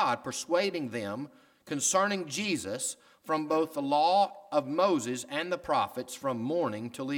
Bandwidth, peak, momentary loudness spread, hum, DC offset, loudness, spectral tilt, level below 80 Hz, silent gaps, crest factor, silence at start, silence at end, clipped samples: 19 kHz; -12 dBFS; 10 LU; none; under 0.1%; -30 LUFS; -3.5 dB/octave; -72 dBFS; none; 18 dB; 0 s; 0 s; under 0.1%